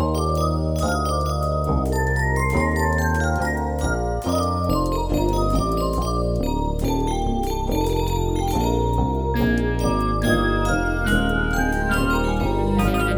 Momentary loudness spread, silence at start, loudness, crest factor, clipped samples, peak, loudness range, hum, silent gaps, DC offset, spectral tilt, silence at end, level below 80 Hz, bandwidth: 3 LU; 0 s; -22 LUFS; 14 dB; under 0.1%; -6 dBFS; 2 LU; none; none; under 0.1%; -6 dB/octave; 0 s; -26 dBFS; over 20 kHz